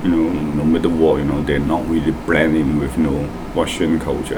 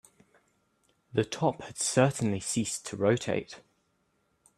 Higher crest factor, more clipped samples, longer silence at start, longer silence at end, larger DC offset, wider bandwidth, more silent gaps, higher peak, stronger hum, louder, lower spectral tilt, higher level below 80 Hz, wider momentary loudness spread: second, 16 dB vs 22 dB; neither; second, 0 s vs 1.15 s; second, 0 s vs 1 s; neither; first, 18.5 kHz vs 14 kHz; neither; first, -2 dBFS vs -8 dBFS; neither; first, -18 LUFS vs -29 LUFS; first, -6.5 dB/octave vs -4.5 dB/octave; first, -32 dBFS vs -66 dBFS; second, 5 LU vs 9 LU